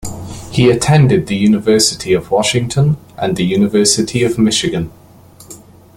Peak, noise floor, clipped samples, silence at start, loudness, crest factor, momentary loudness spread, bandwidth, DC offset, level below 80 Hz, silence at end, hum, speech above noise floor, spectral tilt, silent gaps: 0 dBFS; -41 dBFS; under 0.1%; 0 s; -13 LUFS; 14 dB; 9 LU; 16.5 kHz; under 0.1%; -40 dBFS; 0.4 s; none; 28 dB; -5 dB/octave; none